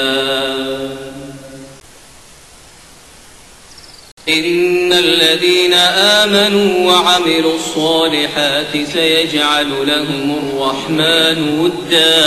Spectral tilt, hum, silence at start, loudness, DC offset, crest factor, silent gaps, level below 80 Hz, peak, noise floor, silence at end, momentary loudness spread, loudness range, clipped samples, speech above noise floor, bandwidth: -3 dB/octave; none; 0 s; -12 LUFS; under 0.1%; 14 dB; 4.12-4.17 s; -48 dBFS; 0 dBFS; -40 dBFS; 0 s; 10 LU; 13 LU; under 0.1%; 27 dB; 13.5 kHz